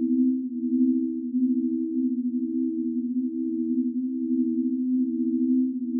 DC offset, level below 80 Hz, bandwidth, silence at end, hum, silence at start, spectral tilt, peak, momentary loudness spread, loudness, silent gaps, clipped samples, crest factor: under 0.1%; -90 dBFS; 0.5 kHz; 0 s; none; 0 s; -15.5 dB/octave; -14 dBFS; 5 LU; -26 LUFS; none; under 0.1%; 12 dB